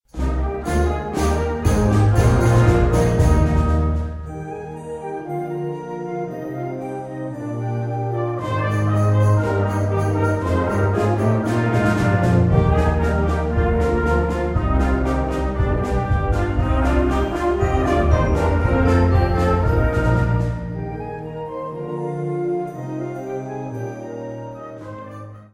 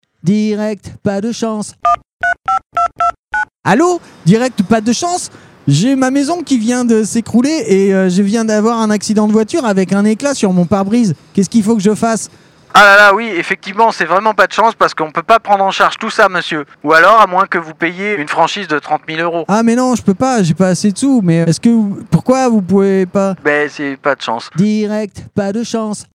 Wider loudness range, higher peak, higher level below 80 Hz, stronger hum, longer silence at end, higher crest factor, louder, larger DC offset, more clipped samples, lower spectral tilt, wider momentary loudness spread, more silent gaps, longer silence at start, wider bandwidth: first, 9 LU vs 4 LU; about the same, -2 dBFS vs 0 dBFS; first, -26 dBFS vs -50 dBFS; neither; about the same, 0.1 s vs 0.1 s; about the same, 16 dB vs 12 dB; second, -20 LUFS vs -12 LUFS; neither; second, under 0.1% vs 0.7%; first, -8 dB/octave vs -5 dB/octave; first, 13 LU vs 8 LU; second, none vs 2.13-2.18 s, 3.19-3.23 s; about the same, 0.15 s vs 0.25 s; first, 16 kHz vs 14.5 kHz